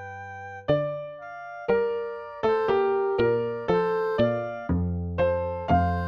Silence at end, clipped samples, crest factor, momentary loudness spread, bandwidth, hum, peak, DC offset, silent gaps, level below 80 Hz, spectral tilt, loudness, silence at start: 0 s; under 0.1%; 16 dB; 13 LU; 6.6 kHz; none; -10 dBFS; under 0.1%; none; -44 dBFS; -8.5 dB/octave; -26 LUFS; 0 s